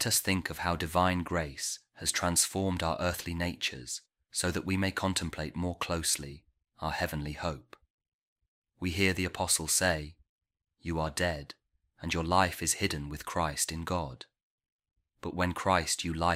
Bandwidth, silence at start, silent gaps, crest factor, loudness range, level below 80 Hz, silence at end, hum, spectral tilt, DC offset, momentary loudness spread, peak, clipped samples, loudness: 16 kHz; 0 s; 7.90-7.98 s, 8.08-8.36 s, 8.48-8.62 s, 10.29-10.38 s, 14.43-14.58 s, 14.72-14.79 s; 22 dB; 4 LU; -50 dBFS; 0 s; none; -3 dB/octave; under 0.1%; 12 LU; -10 dBFS; under 0.1%; -31 LUFS